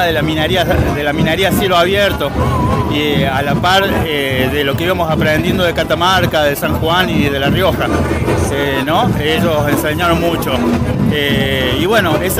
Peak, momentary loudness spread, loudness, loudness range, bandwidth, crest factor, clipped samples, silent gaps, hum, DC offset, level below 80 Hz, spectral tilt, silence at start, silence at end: 0 dBFS; 3 LU; -13 LUFS; 1 LU; 16 kHz; 14 dB; under 0.1%; none; none; under 0.1%; -30 dBFS; -5.5 dB/octave; 0 s; 0 s